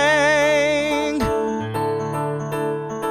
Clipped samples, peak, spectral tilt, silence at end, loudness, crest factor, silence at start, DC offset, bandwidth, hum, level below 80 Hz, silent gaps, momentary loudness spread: under 0.1%; -8 dBFS; -4.5 dB/octave; 0 s; -20 LUFS; 12 dB; 0 s; under 0.1%; 14 kHz; none; -44 dBFS; none; 9 LU